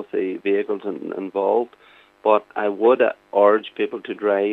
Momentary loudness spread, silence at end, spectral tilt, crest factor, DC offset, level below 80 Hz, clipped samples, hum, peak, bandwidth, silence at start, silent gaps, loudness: 10 LU; 0 s; -7.5 dB/octave; 18 dB; under 0.1%; -76 dBFS; under 0.1%; none; -2 dBFS; 4.2 kHz; 0 s; none; -21 LUFS